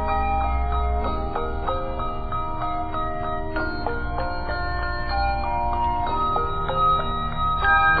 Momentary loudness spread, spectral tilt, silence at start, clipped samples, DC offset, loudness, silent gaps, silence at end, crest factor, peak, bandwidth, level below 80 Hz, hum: 8 LU; -3.5 dB/octave; 0 s; under 0.1%; under 0.1%; -24 LUFS; none; 0 s; 16 dB; -6 dBFS; 4.9 kHz; -28 dBFS; none